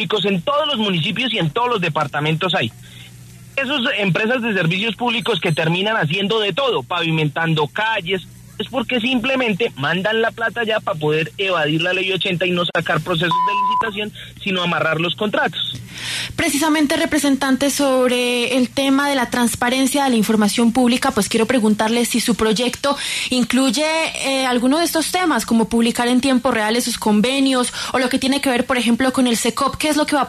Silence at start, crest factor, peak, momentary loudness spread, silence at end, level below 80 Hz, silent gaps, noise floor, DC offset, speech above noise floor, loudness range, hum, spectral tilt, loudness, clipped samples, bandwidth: 0 s; 14 dB; -4 dBFS; 4 LU; 0 s; -50 dBFS; none; -40 dBFS; under 0.1%; 22 dB; 3 LU; none; -4 dB/octave; -18 LUFS; under 0.1%; 13.5 kHz